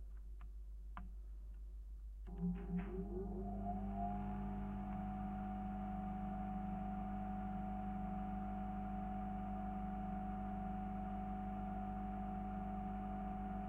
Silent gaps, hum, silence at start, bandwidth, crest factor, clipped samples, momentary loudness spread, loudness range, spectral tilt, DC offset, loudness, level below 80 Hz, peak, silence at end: none; none; 0 s; 3.7 kHz; 14 dB; under 0.1%; 10 LU; 2 LU; -10 dB/octave; under 0.1%; -46 LUFS; -50 dBFS; -32 dBFS; 0 s